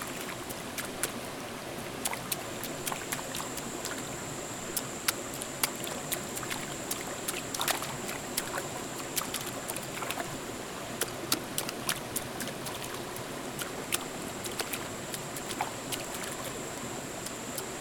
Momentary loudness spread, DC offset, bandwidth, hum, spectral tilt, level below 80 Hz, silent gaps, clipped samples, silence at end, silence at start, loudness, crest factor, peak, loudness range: 6 LU; under 0.1%; 19 kHz; none; -2.5 dB/octave; -60 dBFS; none; under 0.1%; 0 s; 0 s; -35 LUFS; 30 dB; -6 dBFS; 2 LU